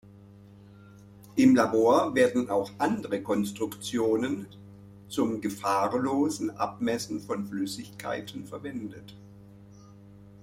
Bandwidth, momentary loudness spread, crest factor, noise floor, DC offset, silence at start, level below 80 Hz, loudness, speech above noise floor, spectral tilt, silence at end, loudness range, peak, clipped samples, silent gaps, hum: 16 kHz; 16 LU; 20 dB; -51 dBFS; under 0.1%; 0.05 s; -64 dBFS; -28 LUFS; 24 dB; -5.5 dB/octave; 0 s; 9 LU; -8 dBFS; under 0.1%; none; none